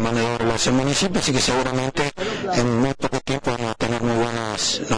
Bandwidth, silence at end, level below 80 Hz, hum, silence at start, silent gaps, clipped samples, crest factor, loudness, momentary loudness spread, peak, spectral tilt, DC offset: 10.5 kHz; 0 s; -40 dBFS; none; 0 s; none; under 0.1%; 12 dB; -21 LUFS; 5 LU; -8 dBFS; -4 dB/octave; under 0.1%